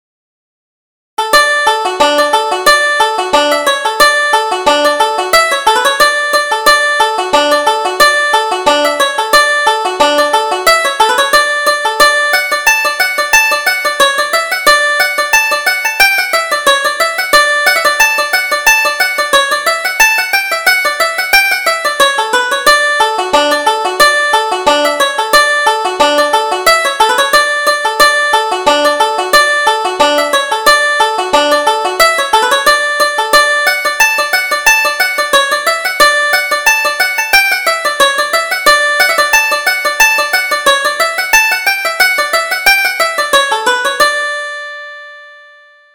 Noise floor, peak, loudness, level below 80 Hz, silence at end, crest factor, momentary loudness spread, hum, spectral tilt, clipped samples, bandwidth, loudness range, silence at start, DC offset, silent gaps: -42 dBFS; 0 dBFS; -9 LUFS; -44 dBFS; 0.6 s; 10 dB; 4 LU; none; 0.5 dB/octave; 0.2%; over 20 kHz; 1 LU; 1.2 s; under 0.1%; none